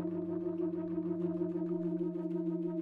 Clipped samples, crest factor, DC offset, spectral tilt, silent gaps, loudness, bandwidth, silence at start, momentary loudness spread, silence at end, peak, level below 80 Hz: under 0.1%; 12 dB; under 0.1%; -12 dB/octave; none; -36 LUFS; 3.3 kHz; 0 s; 2 LU; 0 s; -24 dBFS; -78 dBFS